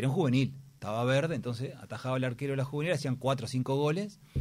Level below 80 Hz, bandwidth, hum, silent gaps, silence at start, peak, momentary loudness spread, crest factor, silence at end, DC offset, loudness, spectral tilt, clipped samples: -66 dBFS; 13 kHz; none; none; 0 s; -16 dBFS; 9 LU; 14 dB; 0 s; under 0.1%; -32 LUFS; -6.5 dB/octave; under 0.1%